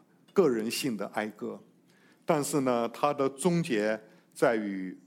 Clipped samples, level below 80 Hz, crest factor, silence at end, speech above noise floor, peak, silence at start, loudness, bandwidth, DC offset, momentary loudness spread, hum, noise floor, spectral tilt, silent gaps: under 0.1%; -80 dBFS; 20 dB; 0.1 s; 33 dB; -10 dBFS; 0.35 s; -29 LUFS; 17 kHz; under 0.1%; 13 LU; none; -62 dBFS; -5 dB/octave; none